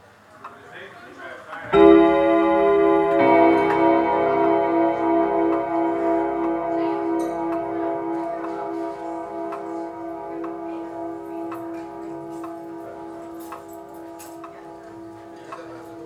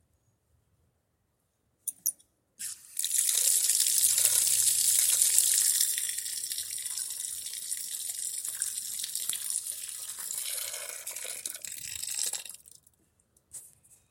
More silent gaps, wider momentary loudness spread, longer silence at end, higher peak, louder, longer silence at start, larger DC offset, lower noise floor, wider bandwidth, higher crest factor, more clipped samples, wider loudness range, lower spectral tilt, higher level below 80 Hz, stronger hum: neither; first, 22 LU vs 15 LU; second, 0 s vs 0.45 s; about the same, -2 dBFS vs -4 dBFS; first, -20 LUFS vs -27 LUFS; second, 0.4 s vs 1.85 s; neither; second, -44 dBFS vs -76 dBFS; second, 12 kHz vs 17 kHz; second, 20 dB vs 28 dB; neither; first, 19 LU vs 12 LU; first, -7 dB/octave vs 3.5 dB/octave; first, -54 dBFS vs -76 dBFS; neither